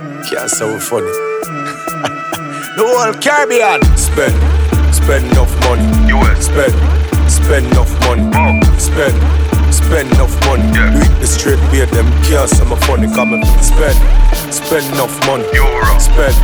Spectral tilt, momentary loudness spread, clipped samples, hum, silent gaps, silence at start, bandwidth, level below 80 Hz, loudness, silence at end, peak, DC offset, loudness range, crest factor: -5 dB/octave; 7 LU; under 0.1%; none; none; 0 s; over 20 kHz; -12 dBFS; -12 LUFS; 0 s; 0 dBFS; under 0.1%; 2 LU; 10 dB